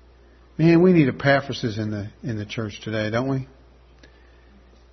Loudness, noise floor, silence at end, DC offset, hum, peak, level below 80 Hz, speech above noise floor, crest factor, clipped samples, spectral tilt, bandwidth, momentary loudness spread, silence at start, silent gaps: -22 LUFS; -51 dBFS; 1.45 s; under 0.1%; none; -4 dBFS; -52 dBFS; 30 dB; 18 dB; under 0.1%; -7.5 dB/octave; 6.4 kHz; 15 LU; 0.6 s; none